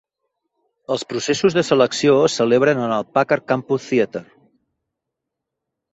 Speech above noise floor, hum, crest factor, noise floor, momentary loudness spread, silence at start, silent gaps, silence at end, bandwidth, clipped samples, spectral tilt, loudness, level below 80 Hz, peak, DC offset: 64 dB; none; 18 dB; -81 dBFS; 9 LU; 0.9 s; none; 1.7 s; 8 kHz; under 0.1%; -5 dB/octave; -18 LUFS; -60 dBFS; -2 dBFS; under 0.1%